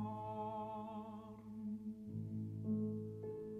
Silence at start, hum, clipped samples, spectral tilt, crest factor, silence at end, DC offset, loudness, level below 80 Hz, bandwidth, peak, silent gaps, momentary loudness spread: 0 s; none; under 0.1%; -10 dB/octave; 14 dB; 0 s; under 0.1%; -46 LUFS; -74 dBFS; 4.3 kHz; -30 dBFS; none; 9 LU